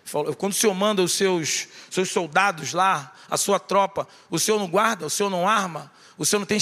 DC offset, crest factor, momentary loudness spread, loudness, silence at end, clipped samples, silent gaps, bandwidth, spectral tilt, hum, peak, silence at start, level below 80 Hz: under 0.1%; 20 dB; 7 LU; -22 LUFS; 0 s; under 0.1%; none; 15.5 kHz; -3 dB/octave; none; -4 dBFS; 0.05 s; -70 dBFS